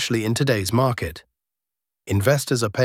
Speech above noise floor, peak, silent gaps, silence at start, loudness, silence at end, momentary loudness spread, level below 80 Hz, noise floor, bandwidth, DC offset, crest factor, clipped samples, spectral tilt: 67 dB; -4 dBFS; none; 0 s; -22 LUFS; 0 s; 7 LU; -50 dBFS; -87 dBFS; 17 kHz; under 0.1%; 18 dB; under 0.1%; -5 dB/octave